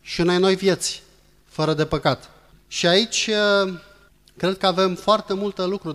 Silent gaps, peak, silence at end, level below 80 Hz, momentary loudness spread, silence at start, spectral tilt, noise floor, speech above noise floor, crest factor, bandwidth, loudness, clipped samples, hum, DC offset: none; -4 dBFS; 0 s; -50 dBFS; 10 LU; 0.05 s; -4 dB/octave; -53 dBFS; 32 dB; 18 dB; 13.5 kHz; -21 LUFS; under 0.1%; none; under 0.1%